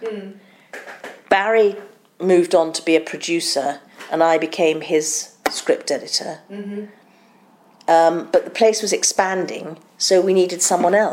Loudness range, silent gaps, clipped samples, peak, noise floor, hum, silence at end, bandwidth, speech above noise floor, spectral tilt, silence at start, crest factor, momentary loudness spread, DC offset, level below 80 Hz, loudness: 4 LU; none; under 0.1%; -2 dBFS; -52 dBFS; none; 0 s; 16.5 kHz; 34 dB; -3 dB/octave; 0 s; 18 dB; 19 LU; under 0.1%; -66 dBFS; -18 LUFS